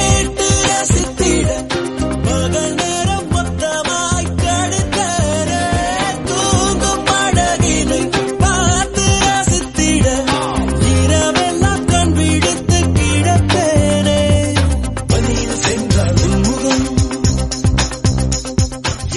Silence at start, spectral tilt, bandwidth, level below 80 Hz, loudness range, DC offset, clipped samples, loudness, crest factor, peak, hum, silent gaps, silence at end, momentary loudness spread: 0 s; -4.5 dB/octave; 11.5 kHz; -24 dBFS; 3 LU; under 0.1%; under 0.1%; -15 LUFS; 14 dB; 0 dBFS; none; none; 0 s; 4 LU